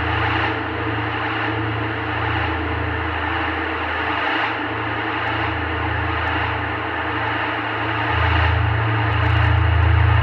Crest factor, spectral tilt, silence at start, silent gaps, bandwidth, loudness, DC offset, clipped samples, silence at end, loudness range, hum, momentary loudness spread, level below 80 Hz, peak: 14 dB; -8 dB/octave; 0 s; none; 5.8 kHz; -20 LUFS; under 0.1%; under 0.1%; 0 s; 3 LU; none; 6 LU; -30 dBFS; -6 dBFS